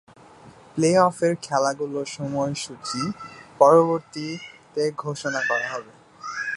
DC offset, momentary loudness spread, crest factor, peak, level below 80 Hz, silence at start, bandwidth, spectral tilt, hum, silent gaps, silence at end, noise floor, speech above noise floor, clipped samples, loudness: under 0.1%; 16 LU; 22 dB; 0 dBFS; -64 dBFS; 0.45 s; 11.5 kHz; -5 dB/octave; none; none; 0 s; -48 dBFS; 26 dB; under 0.1%; -23 LUFS